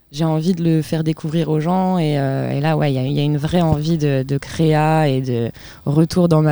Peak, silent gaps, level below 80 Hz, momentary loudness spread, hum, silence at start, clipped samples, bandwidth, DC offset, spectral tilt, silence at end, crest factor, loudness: -4 dBFS; none; -44 dBFS; 6 LU; none; 0.1 s; under 0.1%; over 20 kHz; 0.5%; -7.5 dB/octave; 0 s; 14 dB; -18 LUFS